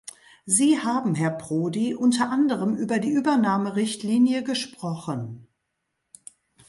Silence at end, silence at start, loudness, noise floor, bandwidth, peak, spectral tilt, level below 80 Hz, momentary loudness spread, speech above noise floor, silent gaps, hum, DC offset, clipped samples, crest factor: 1.25 s; 0.45 s; -23 LUFS; -78 dBFS; 11.5 kHz; -6 dBFS; -4.5 dB/octave; -68 dBFS; 11 LU; 55 dB; none; none; under 0.1%; under 0.1%; 18 dB